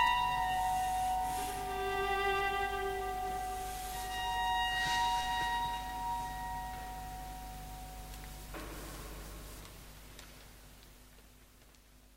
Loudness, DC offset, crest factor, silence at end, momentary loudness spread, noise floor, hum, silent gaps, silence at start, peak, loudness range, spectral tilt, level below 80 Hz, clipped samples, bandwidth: -36 LUFS; under 0.1%; 20 dB; 0 s; 20 LU; -60 dBFS; none; none; 0 s; -18 dBFS; 15 LU; -2.5 dB/octave; -50 dBFS; under 0.1%; 16 kHz